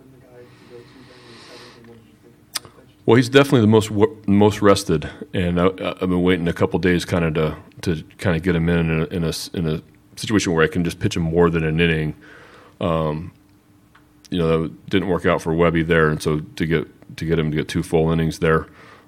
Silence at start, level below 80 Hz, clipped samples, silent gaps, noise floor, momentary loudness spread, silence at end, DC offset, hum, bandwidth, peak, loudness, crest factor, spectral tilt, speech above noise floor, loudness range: 0.35 s; -42 dBFS; under 0.1%; none; -53 dBFS; 12 LU; 0.4 s; under 0.1%; none; 15.5 kHz; 0 dBFS; -20 LUFS; 20 dB; -6 dB/octave; 34 dB; 6 LU